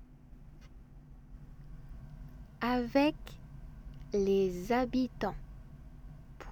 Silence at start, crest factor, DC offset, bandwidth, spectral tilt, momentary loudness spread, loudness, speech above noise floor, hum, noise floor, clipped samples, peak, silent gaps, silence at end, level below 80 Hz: 0 s; 20 dB; under 0.1%; over 20 kHz; -6.5 dB/octave; 24 LU; -32 LUFS; 22 dB; none; -53 dBFS; under 0.1%; -16 dBFS; none; 0 s; -50 dBFS